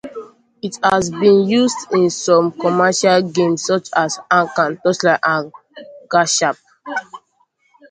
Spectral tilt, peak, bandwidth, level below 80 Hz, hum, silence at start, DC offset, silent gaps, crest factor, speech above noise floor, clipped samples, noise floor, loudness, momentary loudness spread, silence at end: -4 dB/octave; 0 dBFS; 9.6 kHz; -58 dBFS; none; 0.05 s; under 0.1%; none; 16 dB; 46 dB; under 0.1%; -62 dBFS; -16 LUFS; 13 LU; 0.75 s